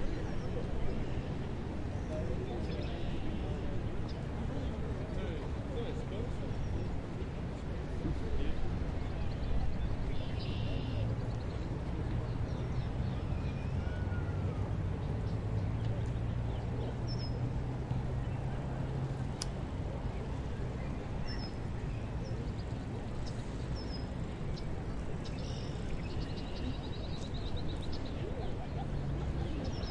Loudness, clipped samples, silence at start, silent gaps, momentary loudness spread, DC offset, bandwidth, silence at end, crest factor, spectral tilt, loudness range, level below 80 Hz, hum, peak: -39 LUFS; under 0.1%; 0 s; none; 4 LU; under 0.1%; 11 kHz; 0 s; 18 dB; -7 dB/octave; 3 LU; -42 dBFS; none; -18 dBFS